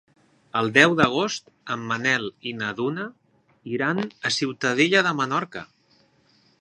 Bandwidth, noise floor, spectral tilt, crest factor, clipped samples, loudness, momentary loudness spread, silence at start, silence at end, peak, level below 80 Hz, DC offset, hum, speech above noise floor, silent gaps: 11 kHz; -61 dBFS; -4 dB/octave; 24 dB; under 0.1%; -23 LUFS; 16 LU; 0.55 s; 0.95 s; 0 dBFS; -64 dBFS; under 0.1%; none; 38 dB; none